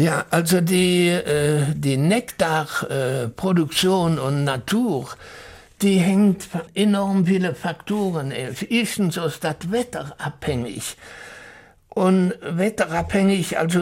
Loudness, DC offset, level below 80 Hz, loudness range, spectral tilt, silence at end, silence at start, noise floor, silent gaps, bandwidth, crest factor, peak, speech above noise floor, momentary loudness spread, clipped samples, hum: -21 LUFS; under 0.1%; -50 dBFS; 5 LU; -5.5 dB/octave; 0 s; 0 s; -46 dBFS; none; 16.5 kHz; 16 dB; -4 dBFS; 25 dB; 12 LU; under 0.1%; none